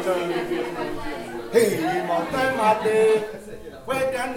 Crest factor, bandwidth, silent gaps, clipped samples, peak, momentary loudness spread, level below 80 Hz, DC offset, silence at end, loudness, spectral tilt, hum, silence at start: 18 dB; 17 kHz; none; under 0.1%; -4 dBFS; 13 LU; -48 dBFS; under 0.1%; 0 s; -23 LUFS; -4.5 dB/octave; none; 0 s